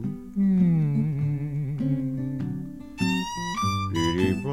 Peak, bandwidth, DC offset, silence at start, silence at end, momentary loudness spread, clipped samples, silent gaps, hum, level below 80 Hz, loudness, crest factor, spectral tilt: -10 dBFS; 14.5 kHz; 0.3%; 0 s; 0 s; 10 LU; under 0.1%; none; none; -50 dBFS; -26 LUFS; 14 dB; -6.5 dB/octave